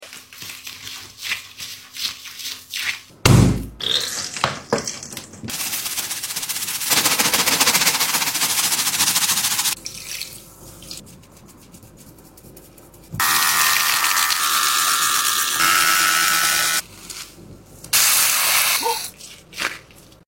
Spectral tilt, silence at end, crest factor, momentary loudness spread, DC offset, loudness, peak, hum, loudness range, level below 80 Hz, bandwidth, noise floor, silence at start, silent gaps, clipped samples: -1.5 dB/octave; 0.45 s; 22 dB; 19 LU; under 0.1%; -17 LUFS; 0 dBFS; none; 8 LU; -42 dBFS; 16.5 kHz; -46 dBFS; 0 s; none; under 0.1%